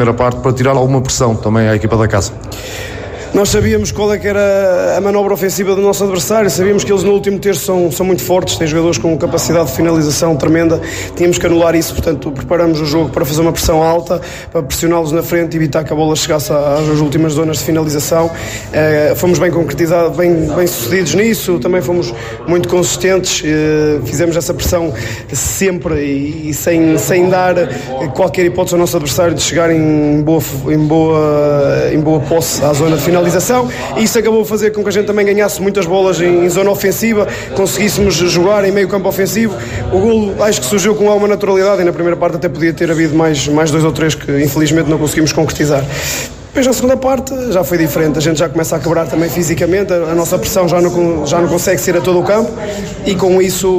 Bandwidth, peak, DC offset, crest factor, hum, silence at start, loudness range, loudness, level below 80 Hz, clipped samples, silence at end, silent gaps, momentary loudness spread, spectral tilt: 16 kHz; -2 dBFS; under 0.1%; 10 dB; none; 0 s; 2 LU; -12 LUFS; -34 dBFS; under 0.1%; 0 s; none; 5 LU; -5 dB/octave